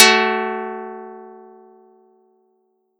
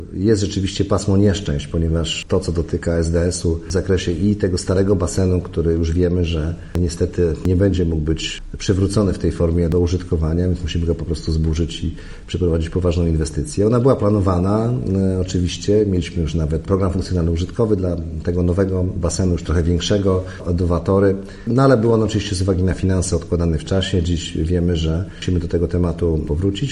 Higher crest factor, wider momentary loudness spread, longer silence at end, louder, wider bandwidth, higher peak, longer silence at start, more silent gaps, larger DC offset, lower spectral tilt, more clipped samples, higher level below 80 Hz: first, 22 dB vs 16 dB; first, 25 LU vs 6 LU; first, 1.7 s vs 0 s; about the same, -18 LUFS vs -19 LUFS; first, over 20 kHz vs 11.5 kHz; about the same, 0 dBFS vs -2 dBFS; about the same, 0 s vs 0 s; neither; neither; second, -0.5 dB/octave vs -6.5 dB/octave; neither; second, -82 dBFS vs -32 dBFS